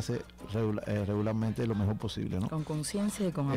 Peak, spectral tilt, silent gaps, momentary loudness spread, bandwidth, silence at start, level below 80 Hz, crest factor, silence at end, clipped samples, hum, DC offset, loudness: -24 dBFS; -6.5 dB/octave; none; 4 LU; 15.5 kHz; 0 s; -54 dBFS; 8 dB; 0 s; under 0.1%; none; under 0.1%; -33 LUFS